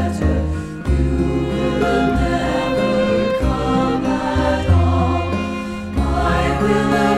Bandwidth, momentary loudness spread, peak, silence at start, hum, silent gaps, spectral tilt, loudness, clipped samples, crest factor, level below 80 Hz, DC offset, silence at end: 12.5 kHz; 6 LU; -2 dBFS; 0 s; none; none; -7 dB/octave; -18 LUFS; under 0.1%; 14 dB; -26 dBFS; under 0.1%; 0 s